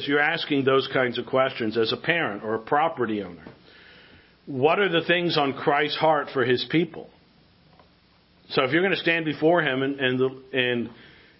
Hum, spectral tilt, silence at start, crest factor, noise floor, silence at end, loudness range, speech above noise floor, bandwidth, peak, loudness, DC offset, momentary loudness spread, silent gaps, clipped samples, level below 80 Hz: none; -9.5 dB/octave; 0 s; 20 dB; -59 dBFS; 0.45 s; 3 LU; 35 dB; 5.8 kHz; -4 dBFS; -23 LUFS; under 0.1%; 7 LU; none; under 0.1%; -66 dBFS